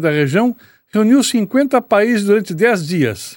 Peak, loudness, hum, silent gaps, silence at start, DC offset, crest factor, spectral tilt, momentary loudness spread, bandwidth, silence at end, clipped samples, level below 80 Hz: 0 dBFS; -15 LUFS; none; none; 0 s; under 0.1%; 14 dB; -5.5 dB/octave; 5 LU; 18 kHz; 0 s; under 0.1%; -60 dBFS